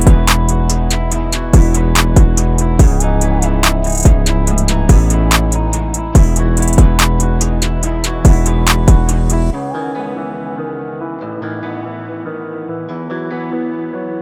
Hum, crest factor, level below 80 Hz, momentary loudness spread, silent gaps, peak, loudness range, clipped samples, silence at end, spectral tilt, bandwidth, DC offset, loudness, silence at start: none; 10 dB; -14 dBFS; 13 LU; none; 0 dBFS; 11 LU; under 0.1%; 0 s; -5 dB/octave; 15.5 kHz; under 0.1%; -14 LUFS; 0 s